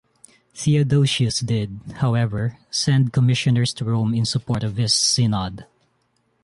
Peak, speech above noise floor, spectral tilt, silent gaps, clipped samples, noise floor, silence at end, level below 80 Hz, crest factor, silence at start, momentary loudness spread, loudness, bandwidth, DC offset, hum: -8 dBFS; 47 dB; -5 dB/octave; none; under 0.1%; -67 dBFS; 0.8 s; -48 dBFS; 14 dB; 0.55 s; 8 LU; -20 LUFS; 11.5 kHz; under 0.1%; none